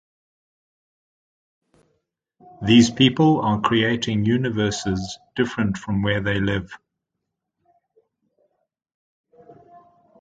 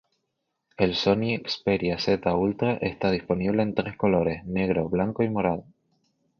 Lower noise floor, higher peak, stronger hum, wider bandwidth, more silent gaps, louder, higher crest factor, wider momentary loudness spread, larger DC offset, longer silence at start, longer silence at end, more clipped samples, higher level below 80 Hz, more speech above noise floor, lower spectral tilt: about the same, -81 dBFS vs -79 dBFS; first, 0 dBFS vs -6 dBFS; neither; first, 9.2 kHz vs 6.8 kHz; first, 8.94-9.24 s vs none; first, -20 LUFS vs -25 LUFS; about the same, 22 dB vs 18 dB; first, 12 LU vs 4 LU; neither; first, 2.6 s vs 0.8 s; about the same, 0.7 s vs 0.8 s; neither; about the same, -48 dBFS vs -50 dBFS; first, 61 dB vs 55 dB; second, -5.5 dB/octave vs -7 dB/octave